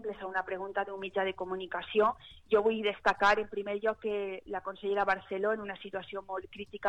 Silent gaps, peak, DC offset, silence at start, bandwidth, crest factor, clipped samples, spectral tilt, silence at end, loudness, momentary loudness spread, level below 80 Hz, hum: none; -16 dBFS; under 0.1%; 0 s; 8.2 kHz; 16 dB; under 0.1%; -5 dB/octave; 0 s; -32 LUFS; 12 LU; -62 dBFS; none